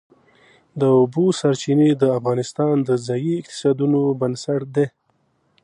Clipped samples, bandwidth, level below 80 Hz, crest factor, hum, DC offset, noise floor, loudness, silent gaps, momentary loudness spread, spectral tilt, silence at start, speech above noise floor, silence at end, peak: under 0.1%; 10.5 kHz; -68 dBFS; 16 dB; none; under 0.1%; -65 dBFS; -19 LUFS; none; 7 LU; -7 dB/octave; 0.75 s; 46 dB; 0.75 s; -4 dBFS